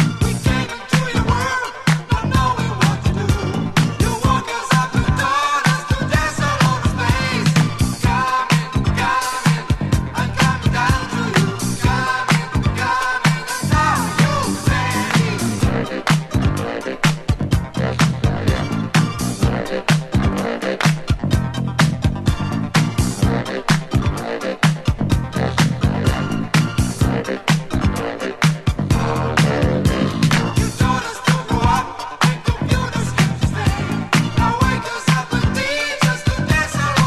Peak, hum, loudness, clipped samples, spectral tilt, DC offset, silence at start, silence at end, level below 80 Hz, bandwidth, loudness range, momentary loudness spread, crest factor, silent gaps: -2 dBFS; none; -18 LUFS; under 0.1%; -5 dB/octave; 0.6%; 0 s; 0 s; -28 dBFS; 13 kHz; 2 LU; 4 LU; 16 dB; none